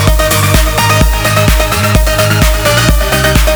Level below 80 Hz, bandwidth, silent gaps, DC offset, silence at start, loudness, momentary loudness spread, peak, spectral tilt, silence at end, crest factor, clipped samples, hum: -12 dBFS; over 20 kHz; none; under 0.1%; 0 s; -9 LUFS; 1 LU; 0 dBFS; -4 dB/octave; 0 s; 8 dB; 0.2%; none